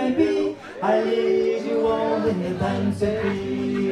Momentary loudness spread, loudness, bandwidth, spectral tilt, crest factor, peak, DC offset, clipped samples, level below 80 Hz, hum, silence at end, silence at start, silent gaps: 5 LU; -23 LUFS; 11.5 kHz; -7 dB/octave; 14 dB; -8 dBFS; under 0.1%; under 0.1%; -50 dBFS; none; 0 s; 0 s; none